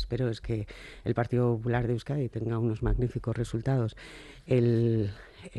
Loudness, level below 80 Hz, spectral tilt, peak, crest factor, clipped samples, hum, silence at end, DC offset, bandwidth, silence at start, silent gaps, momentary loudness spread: -30 LUFS; -42 dBFS; -8.5 dB/octave; -14 dBFS; 16 dB; under 0.1%; none; 0 s; under 0.1%; 10 kHz; 0 s; none; 11 LU